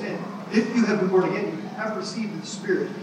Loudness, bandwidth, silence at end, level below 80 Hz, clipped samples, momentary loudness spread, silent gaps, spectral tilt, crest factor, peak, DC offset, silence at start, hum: -25 LUFS; 10.5 kHz; 0 s; -80 dBFS; under 0.1%; 10 LU; none; -6 dB/octave; 16 dB; -8 dBFS; under 0.1%; 0 s; none